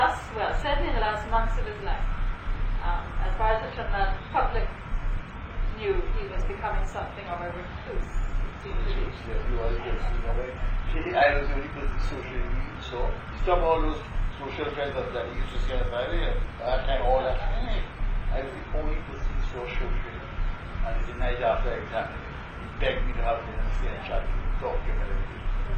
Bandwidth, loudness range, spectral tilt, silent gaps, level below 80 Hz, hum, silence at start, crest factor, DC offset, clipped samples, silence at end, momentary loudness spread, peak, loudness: 7 kHz; 4 LU; -6.5 dB/octave; none; -28 dBFS; none; 0 s; 18 dB; under 0.1%; under 0.1%; 0 s; 9 LU; -8 dBFS; -30 LUFS